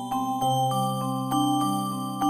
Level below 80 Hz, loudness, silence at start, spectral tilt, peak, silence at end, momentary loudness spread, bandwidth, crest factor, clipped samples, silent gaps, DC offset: -62 dBFS; -26 LUFS; 0 s; -5.5 dB/octave; -12 dBFS; 0 s; 4 LU; 15.5 kHz; 14 dB; under 0.1%; none; under 0.1%